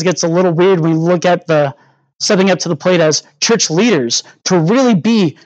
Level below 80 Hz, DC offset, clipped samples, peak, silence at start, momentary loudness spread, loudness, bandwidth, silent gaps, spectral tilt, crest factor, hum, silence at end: -68 dBFS; under 0.1%; under 0.1%; 0 dBFS; 0 s; 4 LU; -13 LUFS; 8.8 kHz; 2.15-2.19 s; -4.5 dB/octave; 12 dB; none; 0.15 s